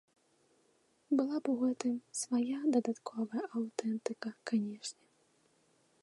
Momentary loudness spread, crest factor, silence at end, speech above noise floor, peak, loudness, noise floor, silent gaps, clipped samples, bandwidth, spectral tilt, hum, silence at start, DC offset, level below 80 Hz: 9 LU; 20 dB; 1.1 s; 38 dB; -18 dBFS; -36 LUFS; -73 dBFS; none; under 0.1%; 11.5 kHz; -4.5 dB/octave; none; 1.1 s; under 0.1%; under -90 dBFS